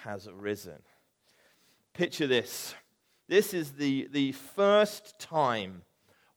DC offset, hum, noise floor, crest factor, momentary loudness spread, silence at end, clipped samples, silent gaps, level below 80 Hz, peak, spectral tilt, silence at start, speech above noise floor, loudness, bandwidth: under 0.1%; none; -68 dBFS; 20 dB; 17 LU; 0.55 s; under 0.1%; none; -76 dBFS; -12 dBFS; -4.5 dB/octave; 0 s; 38 dB; -29 LUFS; 19.5 kHz